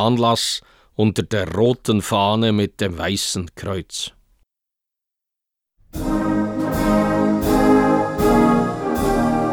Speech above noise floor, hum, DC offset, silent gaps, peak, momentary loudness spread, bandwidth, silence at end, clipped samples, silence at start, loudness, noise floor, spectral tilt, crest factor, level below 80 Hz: 65 dB; none; under 0.1%; none; -2 dBFS; 12 LU; 20 kHz; 0 s; under 0.1%; 0 s; -19 LUFS; -84 dBFS; -5.5 dB/octave; 16 dB; -36 dBFS